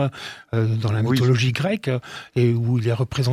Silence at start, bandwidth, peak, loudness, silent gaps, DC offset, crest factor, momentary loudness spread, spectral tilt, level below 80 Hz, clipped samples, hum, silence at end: 0 s; 13.5 kHz; -6 dBFS; -22 LUFS; none; under 0.1%; 14 dB; 9 LU; -7 dB/octave; -54 dBFS; under 0.1%; none; 0 s